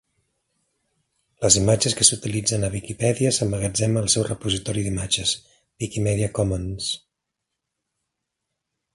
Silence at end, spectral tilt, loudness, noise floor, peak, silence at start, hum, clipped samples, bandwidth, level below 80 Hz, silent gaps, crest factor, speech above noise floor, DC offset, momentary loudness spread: 1.95 s; -3.5 dB/octave; -21 LUFS; -81 dBFS; 0 dBFS; 1.4 s; none; under 0.1%; 11.5 kHz; -44 dBFS; none; 24 dB; 59 dB; under 0.1%; 11 LU